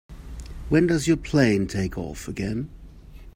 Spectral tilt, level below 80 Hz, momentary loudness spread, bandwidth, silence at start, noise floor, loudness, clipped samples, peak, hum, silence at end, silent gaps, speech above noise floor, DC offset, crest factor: -6 dB/octave; -40 dBFS; 19 LU; 16 kHz; 0.1 s; -43 dBFS; -24 LUFS; under 0.1%; -6 dBFS; none; 0.05 s; none; 21 dB; under 0.1%; 20 dB